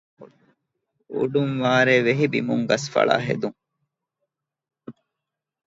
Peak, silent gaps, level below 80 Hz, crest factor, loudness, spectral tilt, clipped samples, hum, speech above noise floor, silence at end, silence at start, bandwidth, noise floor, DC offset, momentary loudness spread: -2 dBFS; none; -66 dBFS; 22 dB; -21 LUFS; -5.5 dB/octave; under 0.1%; none; 64 dB; 0.75 s; 0.2 s; 8 kHz; -85 dBFS; under 0.1%; 10 LU